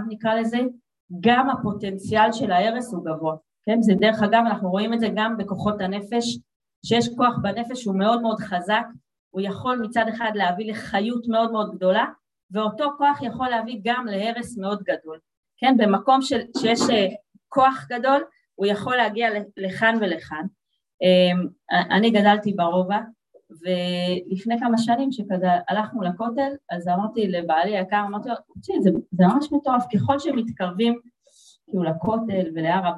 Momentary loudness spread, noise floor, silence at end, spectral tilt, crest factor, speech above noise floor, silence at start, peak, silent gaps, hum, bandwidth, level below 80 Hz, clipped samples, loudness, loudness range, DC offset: 10 LU; -56 dBFS; 0 s; -6 dB/octave; 20 dB; 34 dB; 0 s; -4 dBFS; 1.00-1.08 s, 6.56-6.60 s, 6.76-6.82 s, 9.19-9.31 s, 12.43-12.49 s, 15.37-15.43 s, 20.94-20.98 s; none; 11.5 kHz; -60 dBFS; under 0.1%; -22 LUFS; 3 LU; under 0.1%